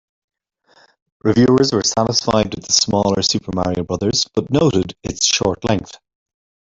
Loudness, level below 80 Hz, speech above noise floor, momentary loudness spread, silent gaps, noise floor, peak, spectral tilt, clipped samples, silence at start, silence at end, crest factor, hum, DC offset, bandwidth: -17 LUFS; -46 dBFS; 39 dB; 7 LU; none; -56 dBFS; -2 dBFS; -4 dB/octave; under 0.1%; 1.25 s; 0.8 s; 18 dB; none; under 0.1%; 8 kHz